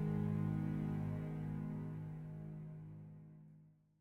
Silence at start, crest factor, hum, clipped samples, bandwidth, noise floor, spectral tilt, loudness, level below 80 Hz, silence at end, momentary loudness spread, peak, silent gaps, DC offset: 0 s; 14 dB; none; under 0.1%; 3.9 kHz; -65 dBFS; -10 dB/octave; -43 LUFS; -62 dBFS; 0.3 s; 19 LU; -28 dBFS; none; under 0.1%